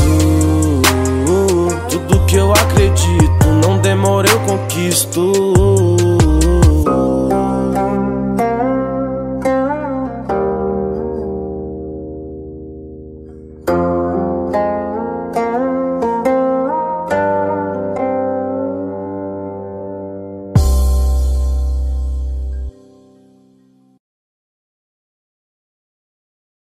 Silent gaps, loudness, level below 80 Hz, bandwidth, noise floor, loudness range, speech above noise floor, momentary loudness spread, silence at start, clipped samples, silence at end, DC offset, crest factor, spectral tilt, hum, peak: none; -15 LUFS; -22 dBFS; 16 kHz; -51 dBFS; 10 LU; 38 dB; 15 LU; 0 s; under 0.1%; 4.05 s; under 0.1%; 16 dB; -5.5 dB/octave; none; 0 dBFS